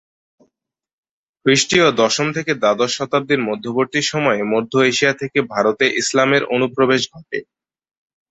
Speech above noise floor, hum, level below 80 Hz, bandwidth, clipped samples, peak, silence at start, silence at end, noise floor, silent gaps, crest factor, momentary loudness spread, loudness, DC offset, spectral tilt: 69 dB; none; -58 dBFS; 8.4 kHz; under 0.1%; -2 dBFS; 1.45 s; 0.9 s; -86 dBFS; none; 16 dB; 7 LU; -17 LUFS; under 0.1%; -3.5 dB/octave